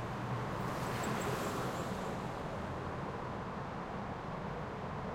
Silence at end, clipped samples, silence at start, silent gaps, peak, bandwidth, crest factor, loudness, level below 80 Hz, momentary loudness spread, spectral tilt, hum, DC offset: 0 s; under 0.1%; 0 s; none; -26 dBFS; 16.5 kHz; 14 dB; -40 LUFS; -56 dBFS; 5 LU; -5.5 dB/octave; none; under 0.1%